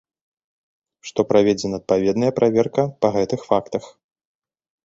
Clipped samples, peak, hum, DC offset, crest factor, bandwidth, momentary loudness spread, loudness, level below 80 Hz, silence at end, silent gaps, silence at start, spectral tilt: under 0.1%; -2 dBFS; none; under 0.1%; 20 dB; 7.8 kHz; 11 LU; -20 LUFS; -56 dBFS; 0.95 s; none; 1.05 s; -6.5 dB/octave